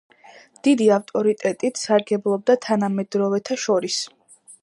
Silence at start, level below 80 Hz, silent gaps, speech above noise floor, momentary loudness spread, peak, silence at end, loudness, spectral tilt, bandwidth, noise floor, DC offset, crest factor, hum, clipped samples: 0.65 s; -74 dBFS; none; 29 dB; 6 LU; -4 dBFS; 0.1 s; -21 LUFS; -4.5 dB/octave; 11.5 kHz; -49 dBFS; under 0.1%; 18 dB; none; under 0.1%